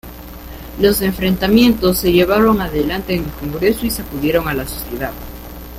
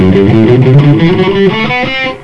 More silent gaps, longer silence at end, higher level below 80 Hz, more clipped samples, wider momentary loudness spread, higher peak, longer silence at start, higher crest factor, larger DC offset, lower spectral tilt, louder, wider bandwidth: neither; about the same, 0 s vs 0.05 s; about the same, -32 dBFS vs -32 dBFS; second, under 0.1% vs 4%; first, 20 LU vs 6 LU; about the same, 0 dBFS vs 0 dBFS; about the same, 0.05 s vs 0 s; first, 16 dB vs 6 dB; neither; second, -5.5 dB/octave vs -8.5 dB/octave; second, -16 LUFS vs -7 LUFS; first, 16.5 kHz vs 6.8 kHz